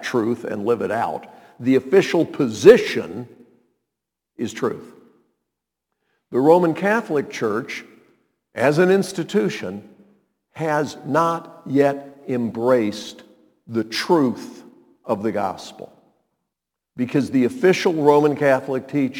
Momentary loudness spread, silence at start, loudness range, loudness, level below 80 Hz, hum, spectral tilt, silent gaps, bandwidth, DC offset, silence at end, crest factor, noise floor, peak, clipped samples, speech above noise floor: 17 LU; 0 s; 6 LU; -20 LUFS; -64 dBFS; none; -6 dB/octave; none; 18.5 kHz; under 0.1%; 0 s; 20 dB; -83 dBFS; 0 dBFS; under 0.1%; 64 dB